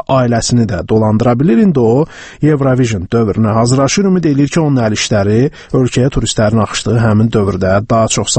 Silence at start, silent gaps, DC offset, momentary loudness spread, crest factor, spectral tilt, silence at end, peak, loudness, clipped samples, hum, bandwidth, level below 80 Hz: 0.1 s; none; under 0.1%; 4 LU; 12 dB; -6 dB/octave; 0 s; 0 dBFS; -12 LUFS; under 0.1%; none; 8.8 kHz; -34 dBFS